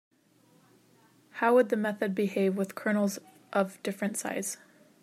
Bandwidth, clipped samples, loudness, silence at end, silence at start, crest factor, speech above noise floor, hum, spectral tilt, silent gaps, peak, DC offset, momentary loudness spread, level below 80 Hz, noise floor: 15.5 kHz; under 0.1%; -29 LUFS; 0.5 s; 1.35 s; 20 dB; 35 dB; none; -5 dB/octave; none; -12 dBFS; under 0.1%; 11 LU; -84 dBFS; -64 dBFS